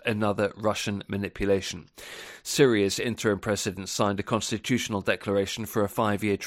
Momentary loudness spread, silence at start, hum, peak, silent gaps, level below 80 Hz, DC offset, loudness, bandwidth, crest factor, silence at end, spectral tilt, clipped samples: 10 LU; 0.05 s; none; -8 dBFS; none; -54 dBFS; under 0.1%; -27 LUFS; 16.5 kHz; 20 dB; 0 s; -4.5 dB/octave; under 0.1%